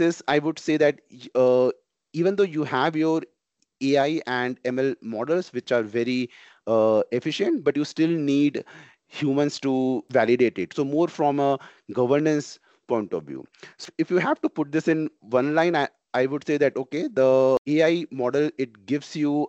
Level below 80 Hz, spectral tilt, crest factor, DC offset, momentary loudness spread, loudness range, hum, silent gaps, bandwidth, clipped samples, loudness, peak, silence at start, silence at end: -72 dBFS; -6 dB/octave; 18 dB; under 0.1%; 9 LU; 3 LU; none; 17.58-17.65 s; 8.2 kHz; under 0.1%; -24 LUFS; -6 dBFS; 0 s; 0 s